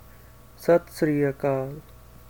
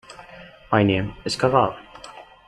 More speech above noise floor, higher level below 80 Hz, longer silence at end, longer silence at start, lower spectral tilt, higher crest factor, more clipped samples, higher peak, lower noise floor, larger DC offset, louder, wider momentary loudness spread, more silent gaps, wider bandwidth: about the same, 26 dB vs 24 dB; about the same, -52 dBFS vs -50 dBFS; first, 0.5 s vs 0.25 s; first, 0.6 s vs 0.1 s; first, -7.5 dB/octave vs -6 dB/octave; about the same, 18 dB vs 20 dB; neither; second, -10 dBFS vs -2 dBFS; first, -49 dBFS vs -44 dBFS; first, 0.2% vs under 0.1%; second, -24 LUFS vs -21 LUFS; second, 12 LU vs 22 LU; neither; first, 19.5 kHz vs 12 kHz